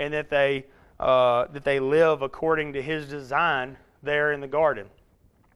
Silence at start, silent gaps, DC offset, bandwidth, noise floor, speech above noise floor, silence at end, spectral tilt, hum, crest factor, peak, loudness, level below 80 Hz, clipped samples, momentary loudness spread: 0 s; none; under 0.1%; 11.5 kHz; -61 dBFS; 37 dB; 0.7 s; -6 dB/octave; none; 16 dB; -8 dBFS; -24 LUFS; -54 dBFS; under 0.1%; 10 LU